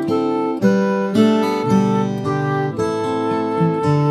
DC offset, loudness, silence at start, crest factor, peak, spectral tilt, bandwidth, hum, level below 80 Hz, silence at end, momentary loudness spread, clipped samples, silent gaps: under 0.1%; -18 LUFS; 0 s; 14 dB; -2 dBFS; -7.5 dB/octave; 12.5 kHz; none; -58 dBFS; 0 s; 5 LU; under 0.1%; none